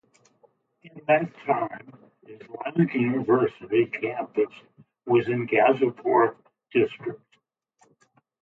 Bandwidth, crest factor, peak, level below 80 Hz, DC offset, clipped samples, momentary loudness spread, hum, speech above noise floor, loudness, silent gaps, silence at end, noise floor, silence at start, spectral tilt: 4.3 kHz; 18 dB; -8 dBFS; -70 dBFS; under 0.1%; under 0.1%; 15 LU; none; 45 dB; -24 LUFS; none; 1.25 s; -69 dBFS; 0.85 s; -9 dB/octave